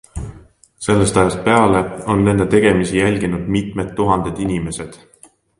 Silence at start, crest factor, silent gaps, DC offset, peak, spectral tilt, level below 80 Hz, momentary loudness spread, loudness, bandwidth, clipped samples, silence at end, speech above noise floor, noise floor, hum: 0.15 s; 16 dB; none; under 0.1%; 0 dBFS; -6 dB/octave; -38 dBFS; 14 LU; -16 LUFS; 11.5 kHz; under 0.1%; 0.65 s; 34 dB; -49 dBFS; none